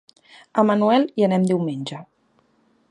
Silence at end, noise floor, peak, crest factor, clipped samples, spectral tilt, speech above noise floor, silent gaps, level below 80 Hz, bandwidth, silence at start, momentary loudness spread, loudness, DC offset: 0.85 s; -63 dBFS; -2 dBFS; 18 dB; under 0.1%; -7 dB/octave; 43 dB; none; -70 dBFS; 10.5 kHz; 0.55 s; 14 LU; -20 LUFS; under 0.1%